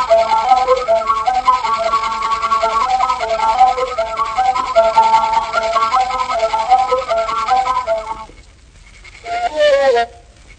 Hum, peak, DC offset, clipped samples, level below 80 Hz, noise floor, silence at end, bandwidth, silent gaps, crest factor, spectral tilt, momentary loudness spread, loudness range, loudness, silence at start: none; 0 dBFS; under 0.1%; under 0.1%; -42 dBFS; -42 dBFS; 0.05 s; 9.6 kHz; none; 14 dB; -2.5 dB/octave; 7 LU; 3 LU; -15 LUFS; 0 s